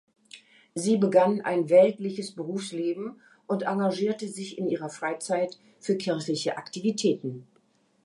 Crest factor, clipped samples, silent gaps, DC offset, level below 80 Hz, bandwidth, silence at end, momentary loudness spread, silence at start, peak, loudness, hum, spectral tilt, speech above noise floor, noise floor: 20 dB; under 0.1%; none; under 0.1%; -80 dBFS; 11.5 kHz; 0.6 s; 14 LU; 0.35 s; -8 dBFS; -27 LUFS; none; -5.5 dB/octave; 40 dB; -66 dBFS